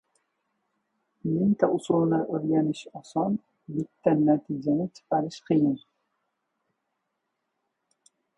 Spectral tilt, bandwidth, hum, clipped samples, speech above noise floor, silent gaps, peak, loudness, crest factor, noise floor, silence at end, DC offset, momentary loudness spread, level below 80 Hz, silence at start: -8 dB/octave; 10.5 kHz; none; under 0.1%; 55 dB; none; -6 dBFS; -26 LUFS; 22 dB; -80 dBFS; 2.6 s; under 0.1%; 11 LU; -66 dBFS; 1.25 s